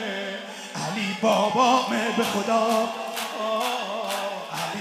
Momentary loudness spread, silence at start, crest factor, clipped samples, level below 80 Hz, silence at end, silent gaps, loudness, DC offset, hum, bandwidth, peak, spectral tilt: 11 LU; 0 s; 18 dB; under 0.1%; -76 dBFS; 0 s; none; -25 LUFS; under 0.1%; none; 16 kHz; -6 dBFS; -3.5 dB/octave